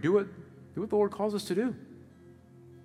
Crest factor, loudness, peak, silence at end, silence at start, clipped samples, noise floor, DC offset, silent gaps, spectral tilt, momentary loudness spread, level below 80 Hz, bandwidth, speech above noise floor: 18 dB; -31 LUFS; -14 dBFS; 0.05 s; 0 s; under 0.1%; -54 dBFS; under 0.1%; none; -6.5 dB/octave; 18 LU; -74 dBFS; 14 kHz; 25 dB